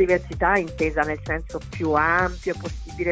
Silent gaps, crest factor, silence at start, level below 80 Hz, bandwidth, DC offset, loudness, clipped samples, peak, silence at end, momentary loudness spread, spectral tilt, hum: none; 16 dB; 0 s; -36 dBFS; 8 kHz; under 0.1%; -23 LUFS; under 0.1%; -6 dBFS; 0 s; 10 LU; -6.5 dB/octave; none